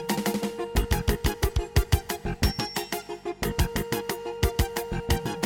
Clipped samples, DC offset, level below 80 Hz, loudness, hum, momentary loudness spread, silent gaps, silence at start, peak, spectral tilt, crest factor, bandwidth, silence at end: under 0.1%; under 0.1%; -32 dBFS; -28 LUFS; none; 6 LU; none; 0 s; -8 dBFS; -5 dB/octave; 18 dB; 17 kHz; 0 s